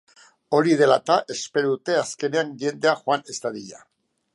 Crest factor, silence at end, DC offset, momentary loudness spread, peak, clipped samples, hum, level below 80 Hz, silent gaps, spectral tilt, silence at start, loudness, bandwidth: 18 dB; 0.55 s; under 0.1%; 13 LU; -4 dBFS; under 0.1%; none; -74 dBFS; none; -4.5 dB/octave; 0.5 s; -22 LUFS; 11.5 kHz